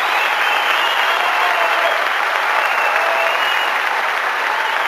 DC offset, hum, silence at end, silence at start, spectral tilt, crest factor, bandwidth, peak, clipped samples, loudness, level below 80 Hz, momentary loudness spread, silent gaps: under 0.1%; none; 0 s; 0 s; 1 dB/octave; 16 dB; 15 kHz; 0 dBFS; under 0.1%; -15 LUFS; -68 dBFS; 3 LU; none